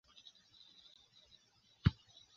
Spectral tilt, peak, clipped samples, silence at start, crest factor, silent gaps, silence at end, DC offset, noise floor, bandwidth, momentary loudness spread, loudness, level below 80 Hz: -6 dB/octave; -16 dBFS; under 0.1%; 1.85 s; 28 dB; none; 0.45 s; under 0.1%; -70 dBFS; 7 kHz; 26 LU; -38 LUFS; -54 dBFS